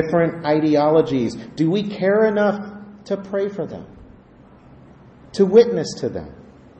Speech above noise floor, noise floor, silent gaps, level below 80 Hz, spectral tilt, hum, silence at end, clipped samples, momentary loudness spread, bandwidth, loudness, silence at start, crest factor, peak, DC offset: 29 dB; -47 dBFS; none; -54 dBFS; -7 dB/octave; none; 0.4 s; under 0.1%; 17 LU; 8.6 kHz; -19 LUFS; 0 s; 18 dB; -2 dBFS; under 0.1%